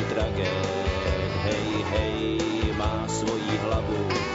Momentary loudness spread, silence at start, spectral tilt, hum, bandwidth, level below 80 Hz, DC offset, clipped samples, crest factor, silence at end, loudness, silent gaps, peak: 1 LU; 0 s; -5.5 dB/octave; none; 8 kHz; -36 dBFS; under 0.1%; under 0.1%; 14 dB; 0 s; -27 LUFS; none; -12 dBFS